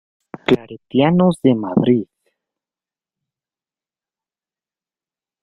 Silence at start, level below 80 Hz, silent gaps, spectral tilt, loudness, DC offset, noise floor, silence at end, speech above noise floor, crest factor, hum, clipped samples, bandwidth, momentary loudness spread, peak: 0.5 s; -56 dBFS; none; -8 dB/octave; -17 LUFS; under 0.1%; under -90 dBFS; 3.4 s; over 75 dB; 20 dB; none; under 0.1%; 10.5 kHz; 8 LU; -2 dBFS